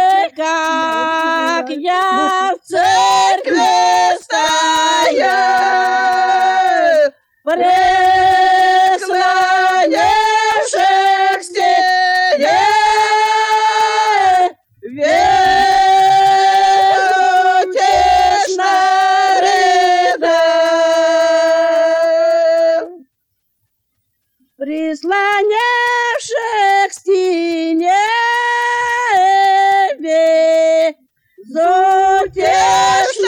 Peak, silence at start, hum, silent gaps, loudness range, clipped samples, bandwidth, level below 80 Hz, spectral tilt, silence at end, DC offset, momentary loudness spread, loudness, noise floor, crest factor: -2 dBFS; 0 s; none; none; 4 LU; under 0.1%; 17 kHz; -48 dBFS; -2 dB/octave; 0 s; under 0.1%; 5 LU; -12 LUFS; -69 dBFS; 10 dB